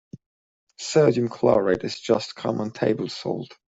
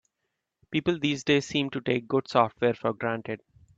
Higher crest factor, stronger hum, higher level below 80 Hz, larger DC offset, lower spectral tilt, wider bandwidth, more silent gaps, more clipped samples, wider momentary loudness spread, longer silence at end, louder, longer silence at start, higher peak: about the same, 20 dB vs 20 dB; neither; about the same, -60 dBFS vs -64 dBFS; neither; about the same, -5.5 dB/octave vs -5.5 dB/octave; about the same, 8 kHz vs 8 kHz; first, 0.26-0.67 s vs none; neither; about the same, 10 LU vs 8 LU; second, 0.2 s vs 0.4 s; first, -23 LUFS vs -27 LUFS; second, 0.15 s vs 0.7 s; first, -4 dBFS vs -8 dBFS